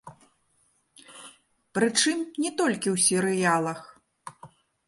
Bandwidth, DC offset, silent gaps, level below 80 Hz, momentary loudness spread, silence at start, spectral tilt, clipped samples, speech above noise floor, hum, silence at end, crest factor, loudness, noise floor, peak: 12 kHz; under 0.1%; none; -72 dBFS; 24 LU; 0.05 s; -3 dB/octave; under 0.1%; 44 dB; none; 0.4 s; 22 dB; -24 LUFS; -68 dBFS; -8 dBFS